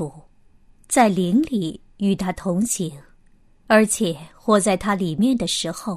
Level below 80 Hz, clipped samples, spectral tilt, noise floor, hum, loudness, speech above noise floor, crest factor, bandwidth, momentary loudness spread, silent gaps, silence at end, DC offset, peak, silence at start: -50 dBFS; under 0.1%; -4.5 dB/octave; -53 dBFS; none; -20 LUFS; 33 dB; 20 dB; 15 kHz; 9 LU; none; 0 s; under 0.1%; -2 dBFS; 0 s